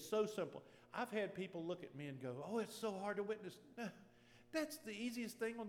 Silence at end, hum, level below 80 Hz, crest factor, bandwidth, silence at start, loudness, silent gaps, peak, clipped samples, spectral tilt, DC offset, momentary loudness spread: 0 s; none; -84 dBFS; 18 dB; 19.5 kHz; 0 s; -46 LUFS; none; -28 dBFS; under 0.1%; -5 dB/octave; under 0.1%; 8 LU